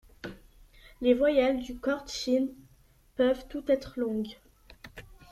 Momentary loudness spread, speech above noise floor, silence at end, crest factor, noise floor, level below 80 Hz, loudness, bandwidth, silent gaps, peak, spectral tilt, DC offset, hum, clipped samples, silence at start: 21 LU; 33 dB; 0.2 s; 20 dB; -61 dBFS; -54 dBFS; -29 LUFS; 14 kHz; none; -12 dBFS; -4.5 dB/octave; under 0.1%; none; under 0.1%; 0.25 s